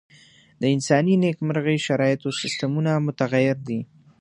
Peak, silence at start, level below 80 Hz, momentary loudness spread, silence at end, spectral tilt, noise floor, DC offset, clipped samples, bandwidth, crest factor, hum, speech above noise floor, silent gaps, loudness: -4 dBFS; 0.6 s; -66 dBFS; 8 LU; 0.35 s; -6 dB/octave; -53 dBFS; under 0.1%; under 0.1%; 11 kHz; 20 dB; none; 31 dB; none; -22 LUFS